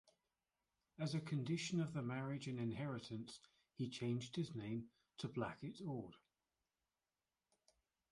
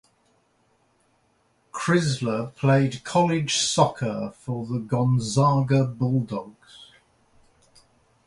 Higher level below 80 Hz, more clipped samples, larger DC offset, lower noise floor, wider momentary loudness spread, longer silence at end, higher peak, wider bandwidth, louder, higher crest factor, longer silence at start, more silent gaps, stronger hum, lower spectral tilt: second, -78 dBFS vs -58 dBFS; neither; neither; first, under -90 dBFS vs -66 dBFS; about the same, 9 LU vs 11 LU; first, 1.95 s vs 1.45 s; second, -28 dBFS vs -4 dBFS; about the same, 11.5 kHz vs 11.5 kHz; second, -46 LUFS vs -23 LUFS; about the same, 18 dB vs 20 dB; second, 1 s vs 1.75 s; neither; neither; about the same, -6 dB/octave vs -5.5 dB/octave